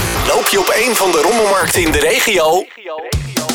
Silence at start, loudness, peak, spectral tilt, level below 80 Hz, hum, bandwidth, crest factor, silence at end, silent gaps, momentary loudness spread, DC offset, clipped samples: 0 s; -13 LUFS; 0 dBFS; -3 dB/octave; -30 dBFS; none; over 20 kHz; 12 dB; 0 s; none; 10 LU; under 0.1%; under 0.1%